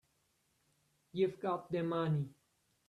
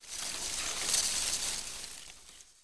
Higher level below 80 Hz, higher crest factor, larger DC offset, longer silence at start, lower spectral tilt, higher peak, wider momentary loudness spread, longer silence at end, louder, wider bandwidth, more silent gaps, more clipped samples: second, -78 dBFS vs -56 dBFS; about the same, 18 dB vs 20 dB; neither; first, 1.15 s vs 0 s; first, -8.5 dB/octave vs 1 dB/octave; second, -22 dBFS vs -16 dBFS; second, 9 LU vs 21 LU; first, 0.55 s vs 0 s; second, -37 LUFS vs -32 LUFS; about the same, 11 kHz vs 11 kHz; neither; neither